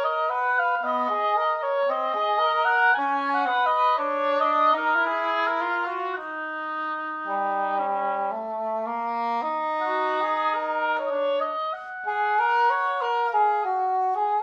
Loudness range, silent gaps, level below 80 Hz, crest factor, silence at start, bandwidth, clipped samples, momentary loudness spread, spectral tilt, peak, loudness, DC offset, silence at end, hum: 5 LU; none; -74 dBFS; 16 dB; 0 s; 7.6 kHz; under 0.1%; 8 LU; -4 dB/octave; -10 dBFS; -24 LUFS; under 0.1%; 0 s; none